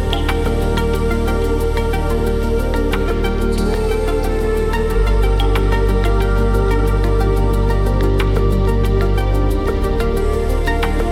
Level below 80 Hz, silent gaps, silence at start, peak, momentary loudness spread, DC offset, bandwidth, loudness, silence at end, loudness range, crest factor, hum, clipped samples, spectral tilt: -18 dBFS; none; 0 s; 0 dBFS; 2 LU; under 0.1%; 15 kHz; -18 LUFS; 0 s; 2 LU; 14 dB; none; under 0.1%; -7 dB/octave